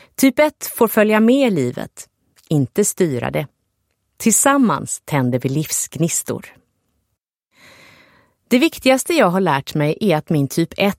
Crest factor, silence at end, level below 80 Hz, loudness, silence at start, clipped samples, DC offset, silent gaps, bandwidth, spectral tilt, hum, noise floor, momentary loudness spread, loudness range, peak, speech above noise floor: 16 dB; 0.05 s; -56 dBFS; -17 LUFS; 0.2 s; under 0.1%; under 0.1%; none; 16.5 kHz; -4.5 dB/octave; none; -74 dBFS; 9 LU; 5 LU; -2 dBFS; 58 dB